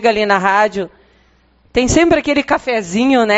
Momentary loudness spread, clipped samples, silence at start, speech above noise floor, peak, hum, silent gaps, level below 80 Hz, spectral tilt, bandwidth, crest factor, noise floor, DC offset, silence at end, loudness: 7 LU; under 0.1%; 0 s; 39 dB; 0 dBFS; none; none; -36 dBFS; -3 dB/octave; 8 kHz; 14 dB; -53 dBFS; under 0.1%; 0 s; -14 LUFS